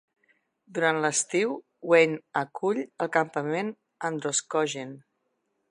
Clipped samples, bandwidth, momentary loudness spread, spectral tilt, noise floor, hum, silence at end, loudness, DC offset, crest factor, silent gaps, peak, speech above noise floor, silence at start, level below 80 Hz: under 0.1%; 11 kHz; 14 LU; -3.5 dB/octave; -77 dBFS; none; 0.7 s; -27 LUFS; under 0.1%; 22 dB; none; -6 dBFS; 50 dB; 0.7 s; -82 dBFS